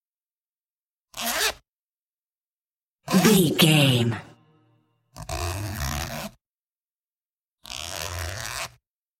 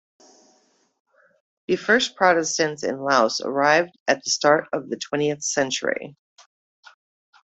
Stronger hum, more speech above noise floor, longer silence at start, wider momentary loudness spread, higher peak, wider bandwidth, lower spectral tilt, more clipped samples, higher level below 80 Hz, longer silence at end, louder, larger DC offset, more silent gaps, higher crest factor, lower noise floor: neither; first, over 71 dB vs 41 dB; second, 1.15 s vs 1.7 s; first, 20 LU vs 9 LU; about the same, -4 dBFS vs -4 dBFS; first, 17 kHz vs 8.2 kHz; first, -4 dB/octave vs -2.5 dB/octave; neither; first, -48 dBFS vs -68 dBFS; second, 0.55 s vs 1.45 s; about the same, -23 LUFS vs -21 LUFS; neither; first, 1.68-2.41 s, 2.47-2.70 s, 2.76-2.80 s, 2.86-2.95 s, 6.46-7.11 s, 7.21-7.37 s, 7.43-7.53 s vs 4.00-4.06 s; about the same, 22 dB vs 20 dB; first, under -90 dBFS vs -63 dBFS